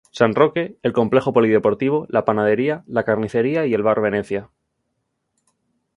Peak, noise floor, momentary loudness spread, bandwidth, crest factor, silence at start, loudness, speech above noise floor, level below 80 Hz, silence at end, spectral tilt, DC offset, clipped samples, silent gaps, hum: 0 dBFS; -74 dBFS; 6 LU; 10.5 kHz; 20 dB; 0.15 s; -19 LUFS; 56 dB; -58 dBFS; 1.5 s; -7.5 dB/octave; under 0.1%; under 0.1%; none; none